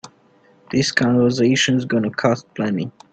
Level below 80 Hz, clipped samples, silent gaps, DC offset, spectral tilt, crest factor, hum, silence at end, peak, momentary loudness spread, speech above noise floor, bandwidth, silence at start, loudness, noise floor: -56 dBFS; under 0.1%; none; under 0.1%; -5 dB/octave; 20 dB; none; 0.25 s; 0 dBFS; 7 LU; 36 dB; 9 kHz; 0.05 s; -19 LUFS; -54 dBFS